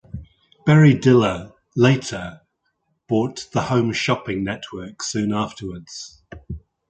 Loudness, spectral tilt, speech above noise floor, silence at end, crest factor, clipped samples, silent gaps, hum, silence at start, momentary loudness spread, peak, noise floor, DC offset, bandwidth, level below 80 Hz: -19 LUFS; -6 dB/octave; 52 dB; 0.3 s; 18 dB; under 0.1%; none; none; 0.15 s; 22 LU; -2 dBFS; -71 dBFS; under 0.1%; 9 kHz; -48 dBFS